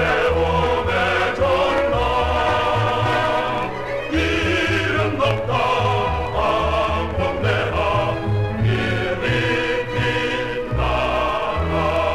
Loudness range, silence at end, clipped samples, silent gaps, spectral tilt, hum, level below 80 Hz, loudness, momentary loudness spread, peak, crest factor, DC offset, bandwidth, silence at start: 2 LU; 0 s; under 0.1%; none; -6 dB/octave; none; -32 dBFS; -20 LUFS; 4 LU; -6 dBFS; 14 dB; 1%; 13.5 kHz; 0 s